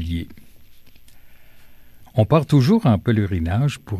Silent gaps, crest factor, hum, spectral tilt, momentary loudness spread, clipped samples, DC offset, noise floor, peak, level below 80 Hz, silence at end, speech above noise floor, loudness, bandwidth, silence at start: none; 16 dB; none; -8 dB/octave; 12 LU; under 0.1%; under 0.1%; -42 dBFS; -4 dBFS; -40 dBFS; 0 s; 24 dB; -19 LUFS; 13.5 kHz; 0 s